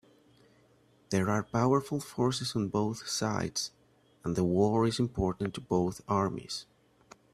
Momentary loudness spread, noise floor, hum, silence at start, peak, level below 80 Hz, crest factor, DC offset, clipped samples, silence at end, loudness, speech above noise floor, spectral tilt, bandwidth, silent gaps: 9 LU; -65 dBFS; none; 1.1 s; -12 dBFS; -56 dBFS; 18 dB; under 0.1%; under 0.1%; 0.7 s; -31 LUFS; 34 dB; -5.5 dB/octave; 14.5 kHz; none